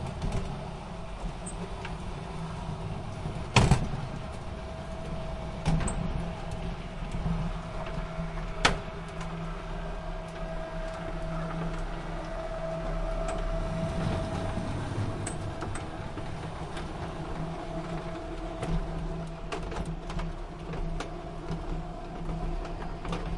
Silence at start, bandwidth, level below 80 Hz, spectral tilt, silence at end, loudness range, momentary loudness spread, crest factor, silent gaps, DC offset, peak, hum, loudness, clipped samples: 0 s; 11.5 kHz; -38 dBFS; -5.5 dB/octave; 0 s; 6 LU; 8 LU; 26 dB; none; under 0.1%; -6 dBFS; none; -35 LUFS; under 0.1%